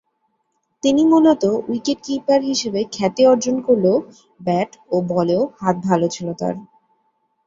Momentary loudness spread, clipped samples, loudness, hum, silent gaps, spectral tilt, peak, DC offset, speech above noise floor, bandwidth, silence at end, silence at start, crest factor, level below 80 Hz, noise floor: 9 LU; under 0.1%; -18 LUFS; none; none; -5.5 dB/octave; -2 dBFS; under 0.1%; 52 dB; 7.6 kHz; 0.85 s; 0.85 s; 16 dB; -60 dBFS; -70 dBFS